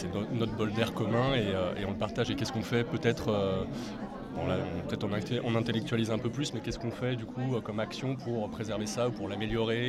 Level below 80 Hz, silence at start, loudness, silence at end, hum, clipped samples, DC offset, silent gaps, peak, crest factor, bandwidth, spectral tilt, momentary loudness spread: -52 dBFS; 0 s; -32 LUFS; 0 s; none; under 0.1%; under 0.1%; none; -14 dBFS; 18 dB; 13.5 kHz; -6 dB/octave; 6 LU